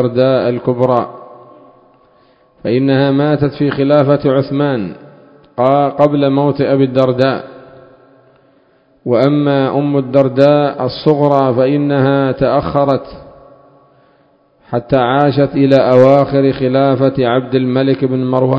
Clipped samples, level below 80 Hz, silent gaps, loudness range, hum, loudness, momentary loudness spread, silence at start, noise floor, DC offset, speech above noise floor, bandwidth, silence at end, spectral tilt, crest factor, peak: 0.2%; -46 dBFS; none; 5 LU; none; -12 LUFS; 6 LU; 0 s; -52 dBFS; under 0.1%; 40 dB; 5.8 kHz; 0 s; -9.5 dB/octave; 12 dB; 0 dBFS